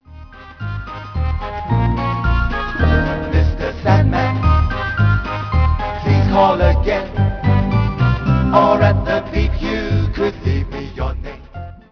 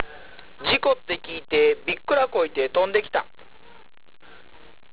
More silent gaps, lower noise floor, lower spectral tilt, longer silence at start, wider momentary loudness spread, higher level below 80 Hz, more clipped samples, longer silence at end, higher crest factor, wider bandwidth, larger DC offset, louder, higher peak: neither; second, -37 dBFS vs -46 dBFS; first, -8.5 dB/octave vs -7 dB/octave; about the same, 0.1 s vs 0 s; first, 13 LU vs 9 LU; first, -22 dBFS vs -56 dBFS; neither; second, 0.15 s vs 1.7 s; about the same, 16 dB vs 20 dB; first, 5.4 kHz vs 4 kHz; second, 0.3% vs 0.7%; first, -17 LUFS vs -23 LUFS; first, 0 dBFS vs -4 dBFS